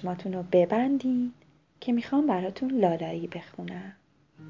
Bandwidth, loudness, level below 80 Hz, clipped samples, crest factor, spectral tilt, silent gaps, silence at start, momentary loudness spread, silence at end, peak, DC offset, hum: 7.2 kHz; -27 LUFS; -68 dBFS; under 0.1%; 18 dB; -8.5 dB/octave; none; 0 s; 15 LU; 0 s; -10 dBFS; under 0.1%; none